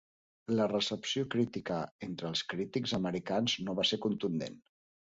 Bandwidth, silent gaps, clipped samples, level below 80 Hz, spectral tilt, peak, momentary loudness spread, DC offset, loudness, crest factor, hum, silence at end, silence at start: 8 kHz; 1.91-1.99 s; under 0.1%; -68 dBFS; -4.5 dB/octave; -18 dBFS; 8 LU; under 0.1%; -34 LUFS; 16 dB; none; 0.55 s; 0.5 s